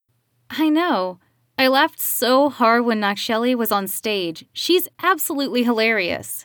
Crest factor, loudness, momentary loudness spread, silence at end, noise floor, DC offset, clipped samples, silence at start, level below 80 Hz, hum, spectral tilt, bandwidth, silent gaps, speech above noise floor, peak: 16 dB; -19 LUFS; 8 LU; 0 s; -66 dBFS; under 0.1%; under 0.1%; 0.5 s; -68 dBFS; none; -3 dB/octave; over 20 kHz; none; 47 dB; -4 dBFS